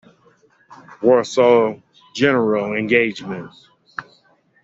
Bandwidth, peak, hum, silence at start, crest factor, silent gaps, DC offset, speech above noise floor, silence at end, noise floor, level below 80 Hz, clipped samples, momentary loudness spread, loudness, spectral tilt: 7.8 kHz; -2 dBFS; none; 0.7 s; 18 dB; none; under 0.1%; 40 dB; 0.6 s; -57 dBFS; -62 dBFS; under 0.1%; 20 LU; -17 LUFS; -5.5 dB/octave